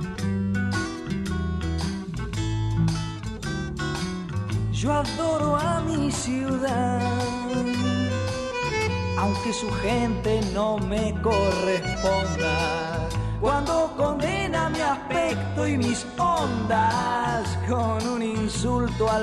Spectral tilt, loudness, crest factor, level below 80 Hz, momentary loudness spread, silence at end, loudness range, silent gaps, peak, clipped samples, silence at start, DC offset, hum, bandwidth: -5.5 dB/octave; -25 LUFS; 14 dB; -38 dBFS; 6 LU; 0 s; 3 LU; none; -10 dBFS; under 0.1%; 0 s; under 0.1%; none; 13 kHz